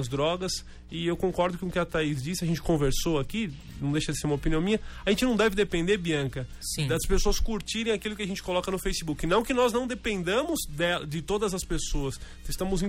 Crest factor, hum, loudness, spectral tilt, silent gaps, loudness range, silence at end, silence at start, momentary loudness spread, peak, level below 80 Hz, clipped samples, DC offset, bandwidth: 16 dB; none; -28 LUFS; -4.5 dB/octave; none; 2 LU; 0 s; 0 s; 8 LU; -10 dBFS; -36 dBFS; under 0.1%; under 0.1%; 16 kHz